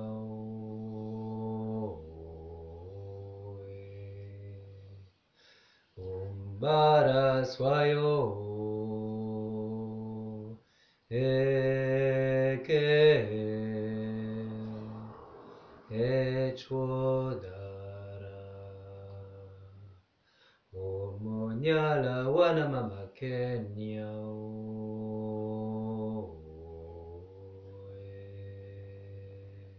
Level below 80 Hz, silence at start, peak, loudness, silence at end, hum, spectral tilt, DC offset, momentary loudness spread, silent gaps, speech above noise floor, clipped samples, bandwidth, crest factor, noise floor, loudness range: -58 dBFS; 0 s; -12 dBFS; -31 LUFS; 0 s; none; -5.5 dB/octave; under 0.1%; 21 LU; none; 41 dB; under 0.1%; 6.6 kHz; 20 dB; -67 dBFS; 18 LU